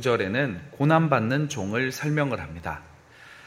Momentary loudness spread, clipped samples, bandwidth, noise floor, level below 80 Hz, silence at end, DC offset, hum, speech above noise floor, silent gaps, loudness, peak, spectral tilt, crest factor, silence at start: 13 LU; under 0.1%; 15.5 kHz; -49 dBFS; -54 dBFS; 0 s; under 0.1%; none; 24 dB; none; -25 LUFS; -6 dBFS; -6 dB/octave; 20 dB; 0 s